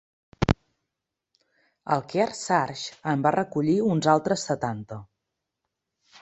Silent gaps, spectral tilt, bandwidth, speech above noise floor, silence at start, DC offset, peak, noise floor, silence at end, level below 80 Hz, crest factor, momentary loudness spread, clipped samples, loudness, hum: none; -5.5 dB/octave; 8.4 kHz; 60 dB; 0.4 s; under 0.1%; -2 dBFS; -85 dBFS; 1.2 s; -48 dBFS; 24 dB; 11 LU; under 0.1%; -25 LUFS; none